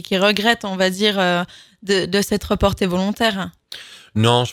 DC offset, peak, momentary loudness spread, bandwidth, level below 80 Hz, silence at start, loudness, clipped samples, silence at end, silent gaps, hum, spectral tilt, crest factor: under 0.1%; 0 dBFS; 15 LU; 18 kHz; -40 dBFS; 0.1 s; -18 LUFS; under 0.1%; 0 s; none; none; -4.5 dB/octave; 18 dB